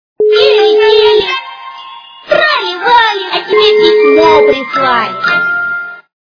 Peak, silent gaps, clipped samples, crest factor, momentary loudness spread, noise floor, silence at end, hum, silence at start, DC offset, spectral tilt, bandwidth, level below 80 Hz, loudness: 0 dBFS; none; 0.7%; 10 dB; 15 LU; -31 dBFS; 0.35 s; none; 0.2 s; under 0.1%; -4 dB/octave; 5.4 kHz; -48 dBFS; -9 LUFS